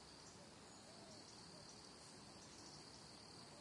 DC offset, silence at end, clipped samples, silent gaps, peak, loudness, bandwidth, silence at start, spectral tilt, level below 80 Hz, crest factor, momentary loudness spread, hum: under 0.1%; 0 s; under 0.1%; none; -46 dBFS; -58 LUFS; 12 kHz; 0 s; -3 dB/octave; -80 dBFS; 14 dB; 2 LU; none